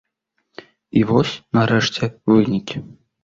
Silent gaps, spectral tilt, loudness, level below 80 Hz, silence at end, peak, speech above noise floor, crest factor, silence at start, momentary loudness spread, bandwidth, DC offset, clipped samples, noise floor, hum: none; -6 dB/octave; -18 LUFS; -50 dBFS; 0.4 s; -2 dBFS; 55 dB; 18 dB; 0.95 s; 8 LU; 7.6 kHz; under 0.1%; under 0.1%; -73 dBFS; none